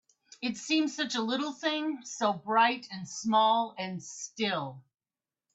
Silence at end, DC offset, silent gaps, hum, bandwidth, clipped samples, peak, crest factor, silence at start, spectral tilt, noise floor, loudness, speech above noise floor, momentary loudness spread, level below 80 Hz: 0.75 s; under 0.1%; none; none; 8.4 kHz; under 0.1%; -14 dBFS; 18 dB; 0.4 s; -3.5 dB/octave; under -90 dBFS; -30 LUFS; over 60 dB; 12 LU; -80 dBFS